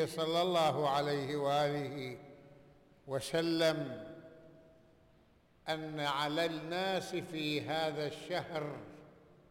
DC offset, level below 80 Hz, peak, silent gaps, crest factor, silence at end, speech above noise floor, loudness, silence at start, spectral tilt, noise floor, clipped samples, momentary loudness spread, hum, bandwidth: under 0.1%; -72 dBFS; -22 dBFS; none; 14 dB; 0.35 s; 31 dB; -35 LUFS; 0 s; -5 dB/octave; -66 dBFS; under 0.1%; 16 LU; none; 17 kHz